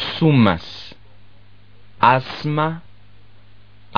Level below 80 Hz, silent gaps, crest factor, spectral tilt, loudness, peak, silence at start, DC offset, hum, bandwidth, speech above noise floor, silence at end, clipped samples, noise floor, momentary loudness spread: -50 dBFS; none; 20 dB; -5 dB/octave; -18 LUFS; 0 dBFS; 0 s; 1%; 50 Hz at -50 dBFS; 6.6 kHz; 33 dB; 1.15 s; under 0.1%; -50 dBFS; 20 LU